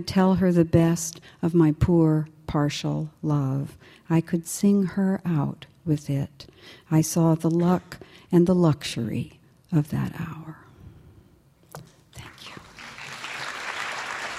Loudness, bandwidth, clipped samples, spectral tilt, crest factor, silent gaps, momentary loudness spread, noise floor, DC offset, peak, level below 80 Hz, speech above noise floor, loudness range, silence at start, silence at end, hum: -24 LUFS; 15 kHz; under 0.1%; -6.5 dB/octave; 18 dB; none; 21 LU; -57 dBFS; under 0.1%; -6 dBFS; -48 dBFS; 34 dB; 13 LU; 0 s; 0 s; none